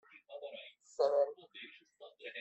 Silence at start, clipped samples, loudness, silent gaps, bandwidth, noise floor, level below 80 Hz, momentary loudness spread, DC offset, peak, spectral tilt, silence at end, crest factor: 0.15 s; under 0.1%; -36 LUFS; none; 8.2 kHz; -59 dBFS; under -90 dBFS; 21 LU; under 0.1%; -20 dBFS; -2 dB/octave; 0 s; 20 dB